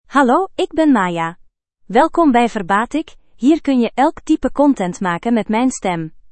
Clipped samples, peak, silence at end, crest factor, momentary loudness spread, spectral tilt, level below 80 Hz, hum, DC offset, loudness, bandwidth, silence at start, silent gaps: under 0.1%; 0 dBFS; 0.1 s; 16 dB; 8 LU; -5.5 dB/octave; -44 dBFS; none; under 0.1%; -16 LUFS; 8.8 kHz; 0.1 s; none